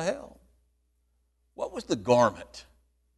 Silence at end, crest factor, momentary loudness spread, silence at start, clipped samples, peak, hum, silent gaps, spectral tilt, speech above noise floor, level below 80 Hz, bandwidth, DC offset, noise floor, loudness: 0.55 s; 22 dB; 22 LU; 0 s; under 0.1%; -8 dBFS; 60 Hz at -50 dBFS; none; -5 dB/octave; 45 dB; -60 dBFS; 12 kHz; under 0.1%; -72 dBFS; -27 LUFS